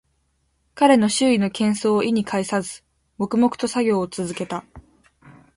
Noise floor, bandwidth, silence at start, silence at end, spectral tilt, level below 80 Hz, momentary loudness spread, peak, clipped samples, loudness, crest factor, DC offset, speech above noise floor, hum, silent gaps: -68 dBFS; 11.5 kHz; 0.75 s; 0.75 s; -5 dB/octave; -58 dBFS; 13 LU; -4 dBFS; under 0.1%; -20 LUFS; 18 dB; under 0.1%; 48 dB; none; none